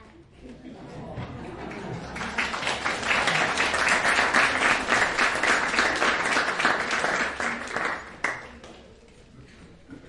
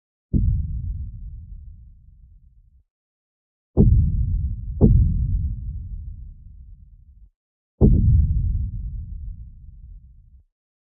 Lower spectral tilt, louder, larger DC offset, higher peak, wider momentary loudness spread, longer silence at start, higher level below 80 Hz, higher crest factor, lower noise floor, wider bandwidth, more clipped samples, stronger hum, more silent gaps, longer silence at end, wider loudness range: second, -2 dB/octave vs -18.5 dB/octave; about the same, -23 LUFS vs -22 LUFS; neither; second, -6 dBFS vs 0 dBFS; second, 17 LU vs 23 LU; second, 0 s vs 0.35 s; second, -52 dBFS vs -26 dBFS; about the same, 20 dB vs 22 dB; about the same, -51 dBFS vs -53 dBFS; first, 11.5 kHz vs 1.2 kHz; neither; neither; second, none vs 2.90-3.74 s, 7.36-7.78 s; second, 0 s vs 0.95 s; about the same, 8 LU vs 8 LU